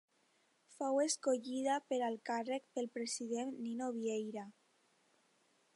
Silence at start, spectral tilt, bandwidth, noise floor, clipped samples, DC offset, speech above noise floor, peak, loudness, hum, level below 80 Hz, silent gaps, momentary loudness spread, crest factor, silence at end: 0.7 s; -3 dB/octave; 11.5 kHz; -76 dBFS; under 0.1%; under 0.1%; 37 dB; -24 dBFS; -39 LUFS; none; under -90 dBFS; none; 8 LU; 18 dB; 1.25 s